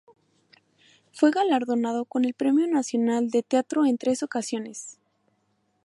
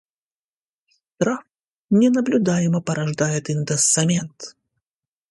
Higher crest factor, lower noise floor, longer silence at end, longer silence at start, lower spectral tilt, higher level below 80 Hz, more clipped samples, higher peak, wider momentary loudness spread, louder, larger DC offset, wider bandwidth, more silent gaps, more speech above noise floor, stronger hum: about the same, 18 dB vs 18 dB; second, -71 dBFS vs under -90 dBFS; about the same, 0.9 s vs 0.8 s; about the same, 1.15 s vs 1.2 s; about the same, -4 dB/octave vs -5 dB/octave; second, -78 dBFS vs -62 dBFS; neither; second, -8 dBFS vs -4 dBFS; about the same, 10 LU vs 12 LU; second, -24 LUFS vs -20 LUFS; neither; about the same, 11.5 kHz vs 11.5 kHz; second, none vs 1.67-1.89 s; second, 47 dB vs over 71 dB; neither